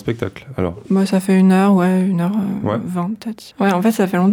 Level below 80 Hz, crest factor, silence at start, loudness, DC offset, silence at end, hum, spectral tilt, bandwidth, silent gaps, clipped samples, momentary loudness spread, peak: -52 dBFS; 10 dB; 0.05 s; -17 LUFS; under 0.1%; 0 s; none; -7.5 dB/octave; 16 kHz; none; under 0.1%; 12 LU; -6 dBFS